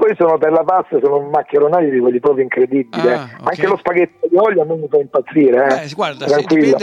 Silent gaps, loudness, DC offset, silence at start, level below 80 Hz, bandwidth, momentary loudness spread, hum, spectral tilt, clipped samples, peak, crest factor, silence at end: none; -14 LUFS; under 0.1%; 0 s; -62 dBFS; 8 kHz; 5 LU; none; -6.5 dB/octave; under 0.1%; -2 dBFS; 10 dB; 0 s